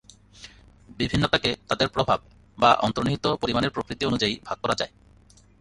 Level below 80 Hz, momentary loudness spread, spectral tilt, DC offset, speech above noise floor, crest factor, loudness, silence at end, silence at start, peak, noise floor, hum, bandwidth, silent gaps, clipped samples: -48 dBFS; 8 LU; -5 dB/octave; under 0.1%; 30 dB; 22 dB; -24 LUFS; 0.75 s; 0.4 s; -4 dBFS; -55 dBFS; none; 11.5 kHz; none; under 0.1%